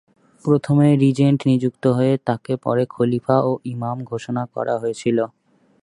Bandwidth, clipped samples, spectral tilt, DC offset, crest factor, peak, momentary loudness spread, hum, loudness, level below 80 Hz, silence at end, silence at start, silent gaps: 11 kHz; under 0.1%; -8 dB/octave; under 0.1%; 18 dB; -2 dBFS; 10 LU; none; -20 LUFS; -60 dBFS; 0.55 s; 0.45 s; none